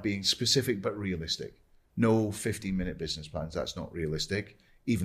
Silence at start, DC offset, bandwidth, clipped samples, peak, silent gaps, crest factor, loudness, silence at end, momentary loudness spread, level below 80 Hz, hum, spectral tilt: 0 s; under 0.1%; 15.5 kHz; under 0.1%; -14 dBFS; none; 18 dB; -31 LUFS; 0 s; 10 LU; -50 dBFS; none; -4.5 dB/octave